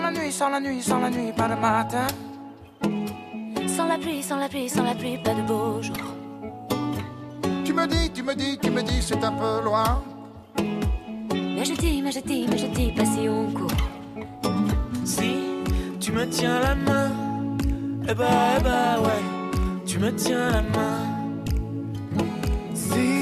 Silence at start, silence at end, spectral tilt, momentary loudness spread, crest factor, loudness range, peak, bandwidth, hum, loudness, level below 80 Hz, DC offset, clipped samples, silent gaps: 0 s; 0 s; -5 dB/octave; 9 LU; 18 dB; 4 LU; -8 dBFS; 14 kHz; none; -25 LUFS; -34 dBFS; under 0.1%; under 0.1%; none